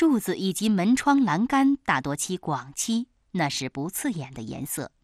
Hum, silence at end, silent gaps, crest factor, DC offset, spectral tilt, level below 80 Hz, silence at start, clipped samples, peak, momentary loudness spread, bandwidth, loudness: none; 0.15 s; none; 18 dB; under 0.1%; -4.5 dB/octave; -58 dBFS; 0 s; under 0.1%; -8 dBFS; 10 LU; 14 kHz; -25 LUFS